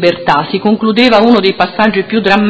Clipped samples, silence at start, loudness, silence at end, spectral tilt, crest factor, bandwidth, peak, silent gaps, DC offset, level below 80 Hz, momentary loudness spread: 0.8%; 0 s; -10 LUFS; 0 s; -6.5 dB/octave; 10 dB; 8 kHz; 0 dBFS; none; under 0.1%; -46 dBFS; 5 LU